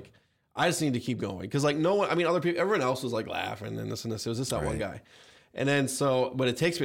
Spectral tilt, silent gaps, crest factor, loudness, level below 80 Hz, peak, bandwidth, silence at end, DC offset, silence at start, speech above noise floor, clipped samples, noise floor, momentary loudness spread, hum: -5 dB/octave; none; 16 dB; -29 LUFS; -54 dBFS; -12 dBFS; 17 kHz; 0 s; under 0.1%; 0 s; 33 dB; under 0.1%; -62 dBFS; 9 LU; none